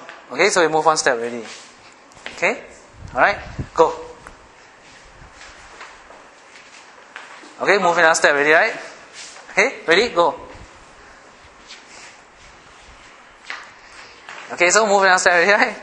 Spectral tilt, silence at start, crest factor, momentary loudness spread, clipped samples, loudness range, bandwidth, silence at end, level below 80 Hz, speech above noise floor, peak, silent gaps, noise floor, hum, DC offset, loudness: -2 dB/octave; 0 s; 20 dB; 26 LU; under 0.1%; 22 LU; 11.5 kHz; 0 s; -52 dBFS; 30 dB; 0 dBFS; none; -46 dBFS; none; under 0.1%; -16 LUFS